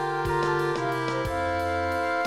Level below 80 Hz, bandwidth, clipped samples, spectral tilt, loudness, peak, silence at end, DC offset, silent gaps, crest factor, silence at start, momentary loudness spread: -46 dBFS; 15.5 kHz; under 0.1%; -6 dB/octave; -27 LUFS; -14 dBFS; 0 s; 0.2%; none; 12 dB; 0 s; 2 LU